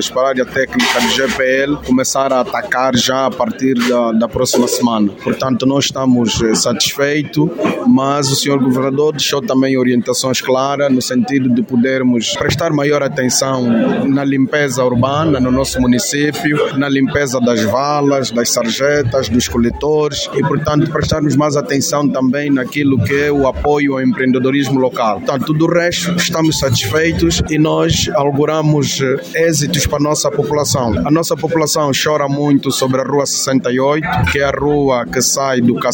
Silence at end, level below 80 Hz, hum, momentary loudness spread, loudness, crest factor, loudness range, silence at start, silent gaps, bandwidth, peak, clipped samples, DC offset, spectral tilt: 0 s; -36 dBFS; none; 2 LU; -14 LUFS; 12 dB; 1 LU; 0 s; none; 17 kHz; 0 dBFS; under 0.1%; under 0.1%; -4.5 dB/octave